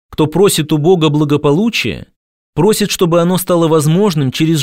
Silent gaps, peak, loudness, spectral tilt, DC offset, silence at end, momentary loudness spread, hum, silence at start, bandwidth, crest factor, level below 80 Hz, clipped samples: 2.16-2.53 s; 0 dBFS; -12 LUFS; -5.5 dB/octave; 0.6%; 0 s; 5 LU; none; 0.1 s; 16.5 kHz; 12 dB; -42 dBFS; under 0.1%